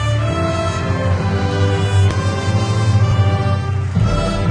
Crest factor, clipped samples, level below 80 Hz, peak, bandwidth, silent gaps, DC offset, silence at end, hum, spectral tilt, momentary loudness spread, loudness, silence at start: 12 dB; under 0.1%; -30 dBFS; -4 dBFS; 10 kHz; none; under 0.1%; 0 s; none; -6.5 dB/octave; 4 LU; -17 LUFS; 0 s